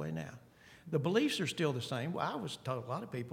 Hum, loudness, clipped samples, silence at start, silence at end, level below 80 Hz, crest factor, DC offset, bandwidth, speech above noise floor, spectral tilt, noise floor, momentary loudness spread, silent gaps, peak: none; -36 LUFS; under 0.1%; 0 s; 0 s; -72 dBFS; 20 dB; under 0.1%; 16.5 kHz; 24 dB; -5.5 dB/octave; -59 dBFS; 13 LU; none; -16 dBFS